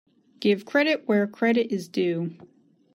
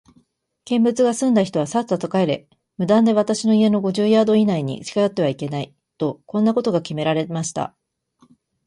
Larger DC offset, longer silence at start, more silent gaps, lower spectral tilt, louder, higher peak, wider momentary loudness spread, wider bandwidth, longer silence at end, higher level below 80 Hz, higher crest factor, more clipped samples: neither; second, 0.4 s vs 0.65 s; neither; about the same, -6.5 dB/octave vs -6 dB/octave; second, -24 LUFS vs -20 LUFS; about the same, -8 dBFS vs -6 dBFS; second, 5 LU vs 11 LU; first, 15 kHz vs 11.5 kHz; second, 0.6 s vs 1 s; second, -76 dBFS vs -64 dBFS; about the same, 18 dB vs 14 dB; neither